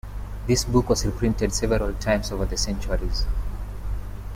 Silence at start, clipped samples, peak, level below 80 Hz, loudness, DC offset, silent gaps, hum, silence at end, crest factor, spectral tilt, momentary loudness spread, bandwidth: 0.05 s; under 0.1%; -6 dBFS; -28 dBFS; -25 LUFS; under 0.1%; none; 50 Hz at -30 dBFS; 0 s; 18 dB; -5 dB/octave; 13 LU; 16 kHz